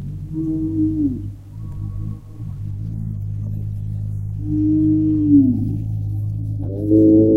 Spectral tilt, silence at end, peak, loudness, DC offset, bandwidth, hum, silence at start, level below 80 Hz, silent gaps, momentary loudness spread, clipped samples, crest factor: -12.5 dB/octave; 0 s; -2 dBFS; -20 LUFS; under 0.1%; 1.2 kHz; none; 0 s; -36 dBFS; none; 16 LU; under 0.1%; 16 dB